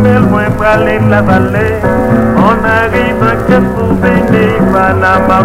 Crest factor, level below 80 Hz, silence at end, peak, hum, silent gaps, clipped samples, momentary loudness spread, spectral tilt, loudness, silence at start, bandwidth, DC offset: 8 dB; -26 dBFS; 0 s; 0 dBFS; none; none; 0.9%; 3 LU; -8 dB/octave; -9 LUFS; 0 s; 15.5 kHz; under 0.1%